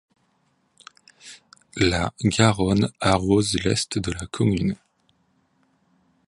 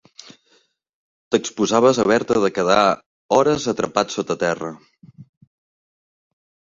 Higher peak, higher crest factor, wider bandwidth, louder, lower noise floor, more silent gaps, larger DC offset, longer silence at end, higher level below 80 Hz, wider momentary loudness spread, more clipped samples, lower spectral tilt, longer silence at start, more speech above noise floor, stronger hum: about the same, 0 dBFS vs 0 dBFS; about the same, 24 dB vs 20 dB; first, 11.5 kHz vs 7.8 kHz; second, -22 LUFS vs -19 LUFS; first, -67 dBFS vs -61 dBFS; second, none vs 3.06-3.29 s; neither; about the same, 1.55 s vs 1.45 s; first, -42 dBFS vs -56 dBFS; first, 19 LU vs 7 LU; neither; about the same, -5 dB/octave vs -4.5 dB/octave; about the same, 1.25 s vs 1.3 s; about the same, 46 dB vs 43 dB; neither